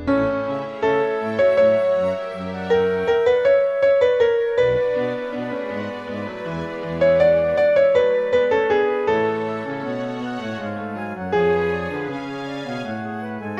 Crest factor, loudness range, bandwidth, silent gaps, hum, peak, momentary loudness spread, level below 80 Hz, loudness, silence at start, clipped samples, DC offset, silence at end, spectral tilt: 14 dB; 6 LU; 7.8 kHz; none; none; -6 dBFS; 12 LU; -50 dBFS; -20 LUFS; 0 s; under 0.1%; under 0.1%; 0 s; -7 dB/octave